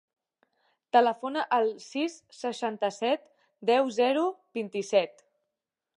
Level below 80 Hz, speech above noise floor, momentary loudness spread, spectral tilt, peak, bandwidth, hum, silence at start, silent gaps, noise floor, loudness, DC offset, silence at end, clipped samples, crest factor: -88 dBFS; 60 dB; 10 LU; -4 dB/octave; -8 dBFS; 11 kHz; none; 0.95 s; none; -87 dBFS; -28 LUFS; under 0.1%; 0.85 s; under 0.1%; 22 dB